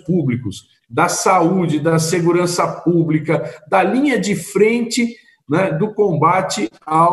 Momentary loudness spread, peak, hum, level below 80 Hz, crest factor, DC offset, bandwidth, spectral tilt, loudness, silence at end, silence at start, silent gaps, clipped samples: 7 LU; 0 dBFS; none; -58 dBFS; 16 dB; under 0.1%; 12.5 kHz; -5.5 dB/octave; -17 LUFS; 0 s; 0.05 s; none; under 0.1%